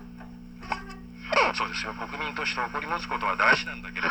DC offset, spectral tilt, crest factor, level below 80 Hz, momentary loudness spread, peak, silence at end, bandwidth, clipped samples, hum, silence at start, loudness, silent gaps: under 0.1%; -3.5 dB/octave; 22 dB; -50 dBFS; 21 LU; -8 dBFS; 0 s; over 20 kHz; under 0.1%; 60 Hz at -45 dBFS; 0 s; -27 LUFS; none